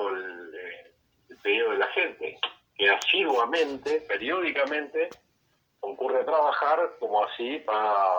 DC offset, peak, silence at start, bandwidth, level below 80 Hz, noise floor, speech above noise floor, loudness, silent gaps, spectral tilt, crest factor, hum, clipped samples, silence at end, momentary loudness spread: under 0.1%; -8 dBFS; 0 s; over 20 kHz; -74 dBFS; -70 dBFS; 45 dB; -26 LUFS; none; -2 dB/octave; 18 dB; none; under 0.1%; 0 s; 16 LU